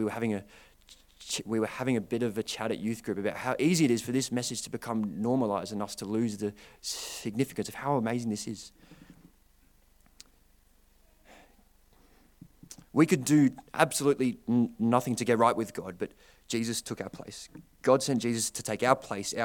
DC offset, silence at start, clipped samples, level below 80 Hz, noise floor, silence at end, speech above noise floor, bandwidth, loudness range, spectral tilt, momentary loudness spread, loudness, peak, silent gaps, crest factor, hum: under 0.1%; 0 s; under 0.1%; -64 dBFS; -63 dBFS; 0 s; 33 dB; 18 kHz; 8 LU; -5 dB/octave; 14 LU; -30 LUFS; -6 dBFS; none; 24 dB; none